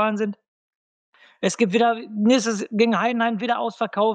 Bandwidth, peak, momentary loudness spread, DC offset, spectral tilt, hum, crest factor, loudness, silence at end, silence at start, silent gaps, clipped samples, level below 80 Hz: 9.4 kHz; -6 dBFS; 8 LU; under 0.1%; -4.5 dB/octave; none; 16 dB; -22 LUFS; 0 s; 0 s; 0.48-1.12 s; under 0.1%; -76 dBFS